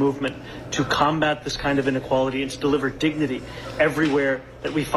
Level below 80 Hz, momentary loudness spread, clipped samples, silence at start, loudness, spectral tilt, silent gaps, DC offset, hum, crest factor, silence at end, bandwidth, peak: -46 dBFS; 9 LU; under 0.1%; 0 s; -23 LUFS; -5 dB/octave; none; under 0.1%; none; 18 dB; 0 s; 13 kHz; -6 dBFS